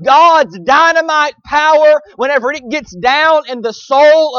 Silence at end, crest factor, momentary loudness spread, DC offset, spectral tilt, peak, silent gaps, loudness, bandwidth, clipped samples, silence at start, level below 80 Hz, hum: 0 s; 10 dB; 10 LU; under 0.1%; -3 dB/octave; 0 dBFS; none; -10 LUFS; 7 kHz; under 0.1%; 0 s; -50 dBFS; none